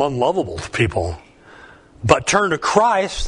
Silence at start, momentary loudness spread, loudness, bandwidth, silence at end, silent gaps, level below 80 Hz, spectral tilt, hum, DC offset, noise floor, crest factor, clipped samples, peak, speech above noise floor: 0 s; 11 LU; -18 LUFS; 11 kHz; 0 s; none; -38 dBFS; -4.5 dB/octave; none; under 0.1%; -44 dBFS; 20 dB; under 0.1%; 0 dBFS; 26 dB